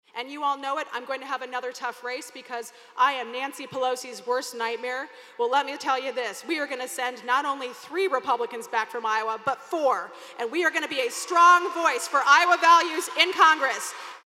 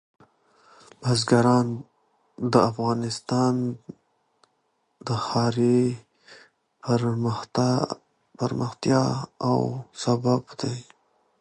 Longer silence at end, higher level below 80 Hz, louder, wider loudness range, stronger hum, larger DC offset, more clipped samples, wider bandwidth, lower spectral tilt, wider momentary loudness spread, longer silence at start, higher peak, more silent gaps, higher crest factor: second, 0.1 s vs 0.6 s; second, -86 dBFS vs -62 dBFS; about the same, -24 LUFS vs -24 LUFS; first, 10 LU vs 3 LU; neither; neither; neither; first, 16 kHz vs 10.5 kHz; second, -0.5 dB/octave vs -6.5 dB/octave; first, 15 LU vs 11 LU; second, 0.15 s vs 1 s; about the same, -4 dBFS vs -4 dBFS; neither; about the same, 22 dB vs 22 dB